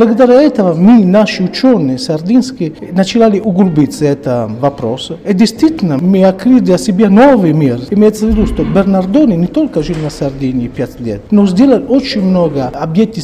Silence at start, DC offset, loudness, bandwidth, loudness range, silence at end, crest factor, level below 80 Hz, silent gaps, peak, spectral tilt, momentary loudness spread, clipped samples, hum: 0 s; under 0.1%; -10 LUFS; 13.5 kHz; 3 LU; 0 s; 10 dB; -32 dBFS; none; 0 dBFS; -7 dB/octave; 10 LU; under 0.1%; none